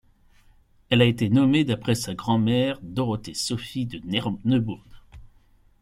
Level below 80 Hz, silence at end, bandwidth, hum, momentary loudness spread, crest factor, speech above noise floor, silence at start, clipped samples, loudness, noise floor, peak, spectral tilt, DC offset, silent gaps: -52 dBFS; 0.6 s; 14.5 kHz; none; 10 LU; 20 dB; 34 dB; 0.9 s; under 0.1%; -24 LUFS; -57 dBFS; -6 dBFS; -6 dB/octave; under 0.1%; none